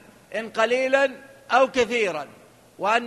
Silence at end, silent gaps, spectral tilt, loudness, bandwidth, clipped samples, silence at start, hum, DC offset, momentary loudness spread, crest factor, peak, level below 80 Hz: 0 s; none; -3 dB/octave; -23 LUFS; 12.5 kHz; under 0.1%; 0.3 s; none; under 0.1%; 14 LU; 18 dB; -6 dBFS; -62 dBFS